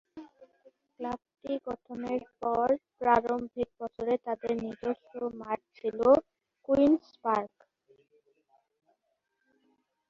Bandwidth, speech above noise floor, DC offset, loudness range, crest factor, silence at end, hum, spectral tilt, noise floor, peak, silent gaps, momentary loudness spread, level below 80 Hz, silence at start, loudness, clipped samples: 7.4 kHz; 49 dB; under 0.1%; 3 LU; 22 dB; 2.6 s; none; -7.5 dB/octave; -80 dBFS; -10 dBFS; none; 14 LU; -64 dBFS; 0.15 s; -30 LUFS; under 0.1%